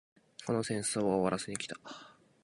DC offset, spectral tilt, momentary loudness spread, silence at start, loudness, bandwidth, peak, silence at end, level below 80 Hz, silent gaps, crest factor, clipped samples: under 0.1%; -4.5 dB/octave; 19 LU; 0.4 s; -34 LUFS; 11.5 kHz; -16 dBFS; 0.3 s; -68 dBFS; none; 20 dB; under 0.1%